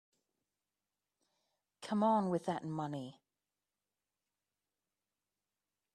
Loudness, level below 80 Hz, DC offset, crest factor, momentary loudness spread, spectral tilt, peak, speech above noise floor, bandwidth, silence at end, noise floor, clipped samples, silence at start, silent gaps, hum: -36 LUFS; -84 dBFS; under 0.1%; 20 dB; 17 LU; -7 dB/octave; -20 dBFS; over 55 dB; 11 kHz; 2.85 s; under -90 dBFS; under 0.1%; 1.8 s; none; 50 Hz at -70 dBFS